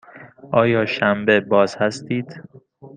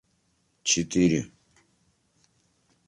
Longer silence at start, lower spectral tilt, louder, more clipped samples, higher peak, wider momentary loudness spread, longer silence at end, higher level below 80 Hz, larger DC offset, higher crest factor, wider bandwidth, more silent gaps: second, 0.15 s vs 0.65 s; first, -6 dB/octave vs -3.5 dB/octave; first, -19 LUFS vs -25 LUFS; neither; first, -2 dBFS vs -10 dBFS; about the same, 10 LU vs 11 LU; second, 0.1 s vs 1.6 s; about the same, -60 dBFS vs -56 dBFS; neither; about the same, 18 dB vs 20 dB; second, 9.4 kHz vs 11.5 kHz; neither